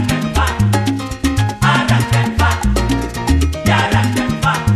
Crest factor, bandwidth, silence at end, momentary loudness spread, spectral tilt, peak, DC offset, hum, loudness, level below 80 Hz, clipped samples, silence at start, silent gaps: 14 dB; 14.5 kHz; 0 s; 5 LU; -5.5 dB/octave; -2 dBFS; under 0.1%; none; -15 LUFS; -22 dBFS; under 0.1%; 0 s; none